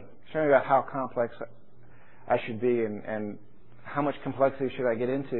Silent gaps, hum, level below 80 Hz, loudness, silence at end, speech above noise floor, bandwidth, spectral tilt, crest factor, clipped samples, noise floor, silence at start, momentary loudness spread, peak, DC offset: none; none; -64 dBFS; -28 LUFS; 0 s; 29 dB; 4.2 kHz; -10.5 dB/octave; 22 dB; under 0.1%; -57 dBFS; 0 s; 14 LU; -8 dBFS; 0.8%